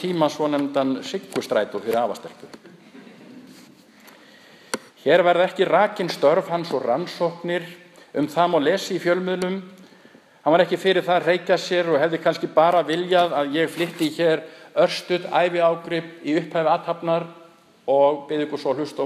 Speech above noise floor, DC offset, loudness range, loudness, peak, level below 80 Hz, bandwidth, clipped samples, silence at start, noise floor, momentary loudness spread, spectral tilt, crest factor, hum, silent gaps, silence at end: 30 dB; under 0.1%; 7 LU; -22 LUFS; -2 dBFS; -76 dBFS; 15 kHz; under 0.1%; 0 s; -51 dBFS; 9 LU; -5 dB/octave; 20 dB; none; none; 0 s